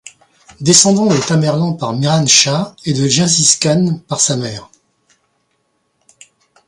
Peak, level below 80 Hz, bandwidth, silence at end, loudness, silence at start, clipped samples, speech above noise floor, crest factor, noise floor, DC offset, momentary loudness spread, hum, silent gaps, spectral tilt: 0 dBFS; -54 dBFS; 11.5 kHz; 2.05 s; -12 LUFS; 0.05 s; under 0.1%; 51 dB; 16 dB; -64 dBFS; under 0.1%; 11 LU; none; none; -3.5 dB/octave